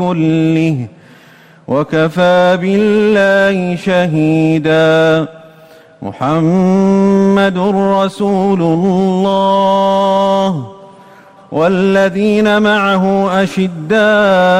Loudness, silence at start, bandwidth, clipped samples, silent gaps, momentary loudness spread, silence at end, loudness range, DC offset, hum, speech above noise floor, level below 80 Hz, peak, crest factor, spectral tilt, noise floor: -11 LUFS; 0 s; 10.5 kHz; under 0.1%; none; 7 LU; 0 s; 2 LU; under 0.1%; none; 31 dB; -48 dBFS; -4 dBFS; 8 dB; -7 dB/octave; -42 dBFS